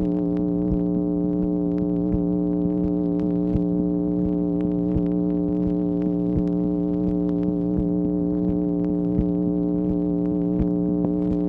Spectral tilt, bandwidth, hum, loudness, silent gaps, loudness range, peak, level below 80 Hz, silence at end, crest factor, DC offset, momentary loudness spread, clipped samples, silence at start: -12.5 dB/octave; 2.9 kHz; none; -23 LUFS; none; 0 LU; -6 dBFS; -38 dBFS; 0 s; 16 dB; under 0.1%; 1 LU; under 0.1%; 0 s